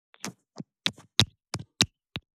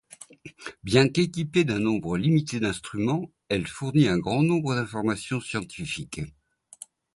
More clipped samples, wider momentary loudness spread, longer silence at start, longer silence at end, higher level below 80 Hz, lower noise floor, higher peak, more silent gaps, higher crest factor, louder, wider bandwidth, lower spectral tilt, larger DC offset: neither; about the same, 17 LU vs 19 LU; about the same, 0.25 s vs 0.2 s; second, 0.15 s vs 0.85 s; about the same, -58 dBFS vs -54 dBFS; about the same, -47 dBFS vs -49 dBFS; first, -2 dBFS vs -6 dBFS; neither; first, 32 dB vs 20 dB; about the same, -27 LUFS vs -25 LUFS; first, 15.5 kHz vs 11.5 kHz; second, -2.5 dB/octave vs -6 dB/octave; neither